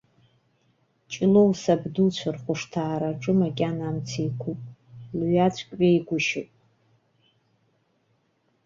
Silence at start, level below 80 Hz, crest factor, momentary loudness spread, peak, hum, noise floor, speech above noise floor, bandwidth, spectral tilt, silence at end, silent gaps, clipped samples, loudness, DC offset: 1.1 s; -60 dBFS; 18 dB; 13 LU; -8 dBFS; none; -69 dBFS; 46 dB; 7.6 kHz; -6.5 dB/octave; 2.2 s; none; under 0.1%; -25 LUFS; under 0.1%